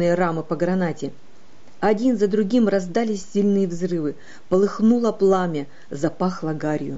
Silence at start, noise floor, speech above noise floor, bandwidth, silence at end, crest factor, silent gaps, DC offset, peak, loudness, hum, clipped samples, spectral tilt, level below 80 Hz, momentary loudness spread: 0 s; -52 dBFS; 31 dB; 8 kHz; 0 s; 14 dB; none; 2%; -8 dBFS; -21 LUFS; none; under 0.1%; -7 dB/octave; -58 dBFS; 8 LU